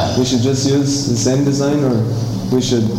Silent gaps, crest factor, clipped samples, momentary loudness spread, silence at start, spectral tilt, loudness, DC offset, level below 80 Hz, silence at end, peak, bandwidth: none; 12 dB; under 0.1%; 3 LU; 0 s; -5.5 dB/octave; -16 LUFS; under 0.1%; -40 dBFS; 0 s; -2 dBFS; 16 kHz